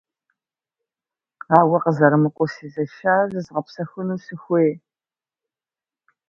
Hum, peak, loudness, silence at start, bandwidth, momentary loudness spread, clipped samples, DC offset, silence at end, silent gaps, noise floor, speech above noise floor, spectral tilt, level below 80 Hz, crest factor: none; 0 dBFS; -20 LUFS; 1.5 s; 7.2 kHz; 13 LU; under 0.1%; under 0.1%; 1.55 s; none; under -90 dBFS; over 71 dB; -9 dB/octave; -68 dBFS; 22 dB